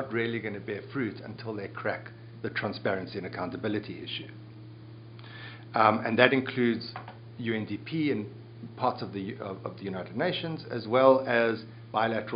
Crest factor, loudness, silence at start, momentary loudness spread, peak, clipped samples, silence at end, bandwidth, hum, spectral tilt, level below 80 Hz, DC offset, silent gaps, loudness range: 28 dB; -29 LUFS; 0 s; 22 LU; -2 dBFS; under 0.1%; 0 s; 5.2 kHz; none; -4 dB/octave; -70 dBFS; under 0.1%; none; 7 LU